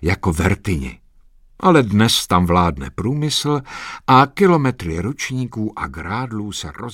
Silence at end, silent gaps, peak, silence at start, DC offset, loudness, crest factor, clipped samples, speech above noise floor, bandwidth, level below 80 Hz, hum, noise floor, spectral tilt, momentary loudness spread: 0 s; none; 0 dBFS; 0 s; under 0.1%; -18 LUFS; 18 dB; under 0.1%; 31 dB; 16.5 kHz; -36 dBFS; none; -49 dBFS; -5.5 dB/octave; 12 LU